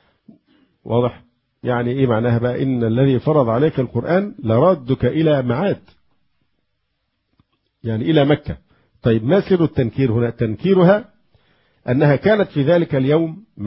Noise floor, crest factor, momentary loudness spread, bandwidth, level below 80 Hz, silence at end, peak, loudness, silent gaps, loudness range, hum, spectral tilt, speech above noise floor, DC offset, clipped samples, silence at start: -72 dBFS; 16 dB; 8 LU; 5.8 kHz; -46 dBFS; 0 s; -2 dBFS; -17 LUFS; none; 5 LU; none; -12.5 dB/octave; 55 dB; under 0.1%; under 0.1%; 0.85 s